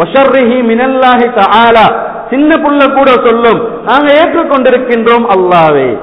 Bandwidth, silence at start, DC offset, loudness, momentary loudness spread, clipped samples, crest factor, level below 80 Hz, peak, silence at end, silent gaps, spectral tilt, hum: 5.4 kHz; 0 s; 0.5%; -7 LUFS; 4 LU; 1%; 6 dB; -40 dBFS; 0 dBFS; 0 s; none; -8 dB/octave; none